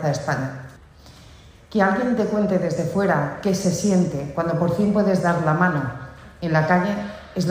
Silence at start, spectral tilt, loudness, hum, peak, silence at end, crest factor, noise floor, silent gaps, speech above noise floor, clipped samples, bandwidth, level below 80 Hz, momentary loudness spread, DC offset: 0 s; -6.5 dB/octave; -21 LUFS; none; -6 dBFS; 0 s; 16 dB; -46 dBFS; none; 26 dB; under 0.1%; 15.5 kHz; -50 dBFS; 11 LU; under 0.1%